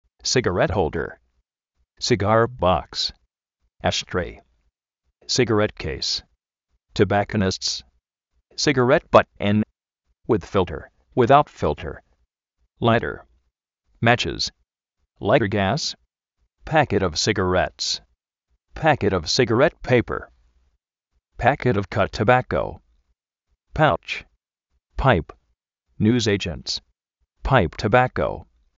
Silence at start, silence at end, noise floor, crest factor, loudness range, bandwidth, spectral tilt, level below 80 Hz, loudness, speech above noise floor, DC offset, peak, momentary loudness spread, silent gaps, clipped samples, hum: 0.25 s; 0.35 s; -76 dBFS; 22 dB; 4 LU; 8 kHz; -4 dB/octave; -42 dBFS; -21 LUFS; 56 dB; under 0.1%; 0 dBFS; 12 LU; none; under 0.1%; none